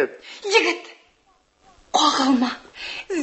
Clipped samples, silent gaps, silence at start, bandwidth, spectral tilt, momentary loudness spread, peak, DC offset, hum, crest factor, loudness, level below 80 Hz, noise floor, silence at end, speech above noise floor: under 0.1%; none; 0 s; 8.6 kHz; -1.5 dB/octave; 14 LU; -4 dBFS; under 0.1%; none; 20 dB; -21 LUFS; -62 dBFS; -61 dBFS; 0 s; 40 dB